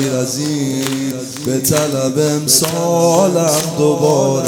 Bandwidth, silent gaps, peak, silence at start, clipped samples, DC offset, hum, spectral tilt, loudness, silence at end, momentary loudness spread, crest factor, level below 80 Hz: over 20 kHz; none; 0 dBFS; 0 s; under 0.1%; under 0.1%; none; -4.5 dB/octave; -14 LUFS; 0 s; 7 LU; 14 dB; -52 dBFS